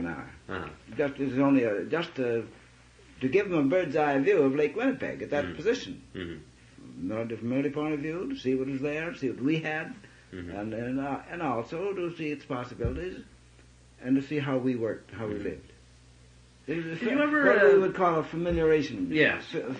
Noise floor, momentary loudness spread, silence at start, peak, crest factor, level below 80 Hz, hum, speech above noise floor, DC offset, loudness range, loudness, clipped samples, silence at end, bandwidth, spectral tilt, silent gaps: -55 dBFS; 16 LU; 0 s; -10 dBFS; 20 dB; -54 dBFS; none; 27 dB; under 0.1%; 8 LU; -28 LUFS; under 0.1%; 0 s; 9.6 kHz; -7 dB/octave; none